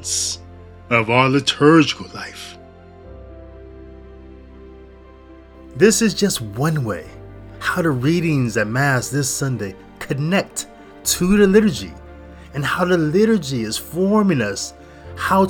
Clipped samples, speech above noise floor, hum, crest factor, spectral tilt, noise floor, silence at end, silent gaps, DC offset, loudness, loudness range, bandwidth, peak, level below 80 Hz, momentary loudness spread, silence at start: under 0.1%; 25 dB; none; 20 dB; -4.5 dB/octave; -42 dBFS; 0 s; none; under 0.1%; -18 LUFS; 4 LU; 19.5 kHz; 0 dBFS; -44 dBFS; 20 LU; 0 s